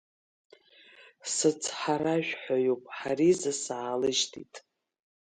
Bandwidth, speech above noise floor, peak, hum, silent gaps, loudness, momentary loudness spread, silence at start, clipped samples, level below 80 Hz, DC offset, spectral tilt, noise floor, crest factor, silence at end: 9.6 kHz; 28 dB; -12 dBFS; none; none; -29 LUFS; 9 LU; 1 s; under 0.1%; -74 dBFS; under 0.1%; -3.5 dB/octave; -57 dBFS; 18 dB; 0.65 s